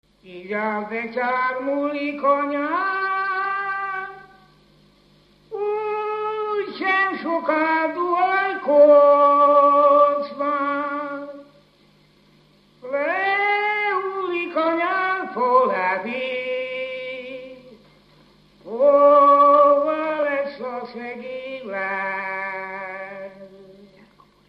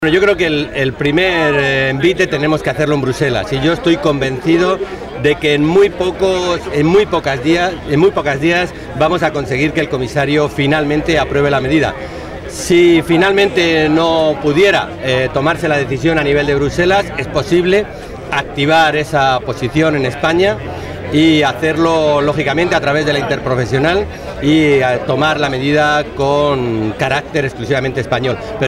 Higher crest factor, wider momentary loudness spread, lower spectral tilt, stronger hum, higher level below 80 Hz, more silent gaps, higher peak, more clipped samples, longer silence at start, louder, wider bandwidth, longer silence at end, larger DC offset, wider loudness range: first, 16 dB vs 10 dB; first, 18 LU vs 6 LU; about the same, -6 dB/octave vs -5.5 dB/octave; first, 50 Hz at -60 dBFS vs none; second, -68 dBFS vs -36 dBFS; neither; about the same, -4 dBFS vs -2 dBFS; neither; first, 0.25 s vs 0 s; second, -20 LUFS vs -13 LUFS; second, 5.4 kHz vs 15 kHz; first, 0.75 s vs 0 s; neither; first, 11 LU vs 2 LU